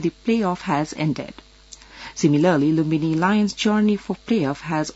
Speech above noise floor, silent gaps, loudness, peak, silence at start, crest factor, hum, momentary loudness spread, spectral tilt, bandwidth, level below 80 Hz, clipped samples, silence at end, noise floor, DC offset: 26 dB; none; -21 LUFS; -4 dBFS; 0 s; 16 dB; none; 8 LU; -6 dB/octave; 8 kHz; -52 dBFS; under 0.1%; 0.05 s; -46 dBFS; under 0.1%